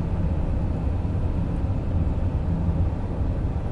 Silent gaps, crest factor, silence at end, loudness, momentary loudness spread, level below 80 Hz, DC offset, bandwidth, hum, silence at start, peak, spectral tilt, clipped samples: none; 12 dB; 0 s; -26 LUFS; 2 LU; -28 dBFS; under 0.1%; 5 kHz; none; 0 s; -12 dBFS; -10 dB/octave; under 0.1%